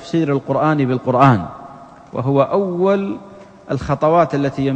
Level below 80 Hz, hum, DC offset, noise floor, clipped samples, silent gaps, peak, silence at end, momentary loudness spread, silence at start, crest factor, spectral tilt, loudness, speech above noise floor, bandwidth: -46 dBFS; none; under 0.1%; -38 dBFS; under 0.1%; none; 0 dBFS; 0 s; 13 LU; 0 s; 16 dB; -8.5 dB/octave; -17 LUFS; 23 dB; 8.4 kHz